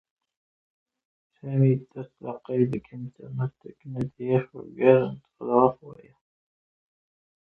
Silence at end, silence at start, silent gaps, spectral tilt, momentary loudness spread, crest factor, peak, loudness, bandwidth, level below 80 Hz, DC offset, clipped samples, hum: 1.6 s; 1.45 s; none; -11 dB/octave; 20 LU; 24 dB; -4 dBFS; -25 LUFS; 4 kHz; -64 dBFS; under 0.1%; under 0.1%; none